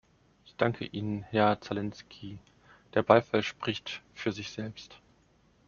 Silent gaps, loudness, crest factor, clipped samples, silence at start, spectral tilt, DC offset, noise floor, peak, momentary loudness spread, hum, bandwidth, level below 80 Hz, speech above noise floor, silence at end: none; -30 LUFS; 28 dB; under 0.1%; 0.6 s; -4.5 dB/octave; under 0.1%; -65 dBFS; -4 dBFS; 22 LU; none; 7.2 kHz; -66 dBFS; 35 dB; 0.7 s